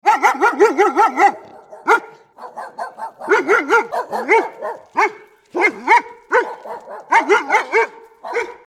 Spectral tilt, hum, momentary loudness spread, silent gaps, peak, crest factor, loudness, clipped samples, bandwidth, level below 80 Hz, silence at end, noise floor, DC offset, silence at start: -2.5 dB/octave; none; 17 LU; none; 0 dBFS; 16 dB; -16 LUFS; under 0.1%; 14.5 kHz; -74 dBFS; 0.15 s; -39 dBFS; under 0.1%; 0.05 s